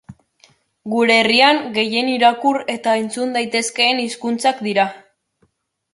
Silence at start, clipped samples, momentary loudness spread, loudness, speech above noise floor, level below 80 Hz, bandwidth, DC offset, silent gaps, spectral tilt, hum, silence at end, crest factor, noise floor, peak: 0.1 s; under 0.1%; 9 LU; -16 LUFS; 47 dB; -66 dBFS; 11.5 kHz; under 0.1%; none; -2.5 dB/octave; none; 0.95 s; 18 dB; -64 dBFS; -2 dBFS